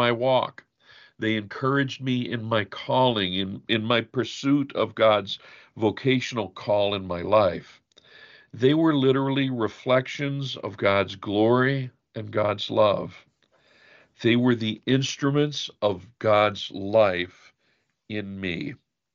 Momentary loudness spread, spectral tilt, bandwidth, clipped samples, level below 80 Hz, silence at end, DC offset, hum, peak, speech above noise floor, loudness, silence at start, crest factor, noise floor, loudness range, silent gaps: 10 LU; -6 dB/octave; 7.4 kHz; under 0.1%; -64 dBFS; 0.4 s; under 0.1%; none; -6 dBFS; 47 dB; -24 LUFS; 0 s; 18 dB; -70 dBFS; 2 LU; none